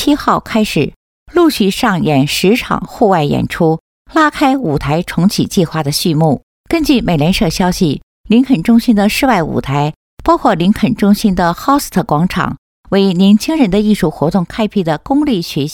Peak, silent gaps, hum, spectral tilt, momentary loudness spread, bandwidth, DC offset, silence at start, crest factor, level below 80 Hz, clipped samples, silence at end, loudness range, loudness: 0 dBFS; 0.96-1.26 s, 3.80-4.05 s, 6.43-6.64 s, 8.03-8.24 s, 9.96-10.17 s, 12.58-12.84 s; none; -6 dB/octave; 6 LU; 18 kHz; under 0.1%; 0 s; 12 dB; -34 dBFS; under 0.1%; 0 s; 1 LU; -13 LUFS